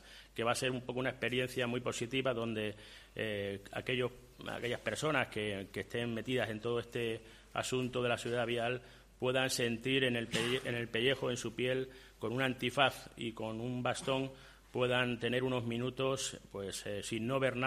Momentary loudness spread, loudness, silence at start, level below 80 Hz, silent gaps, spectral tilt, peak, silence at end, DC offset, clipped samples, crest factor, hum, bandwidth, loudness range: 10 LU; -36 LUFS; 0 s; -62 dBFS; none; -4.5 dB/octave; -12 dBFS; 0 s; under 0.1%; under 0.1%; 24 dB; none; 15 kHz; 3 LU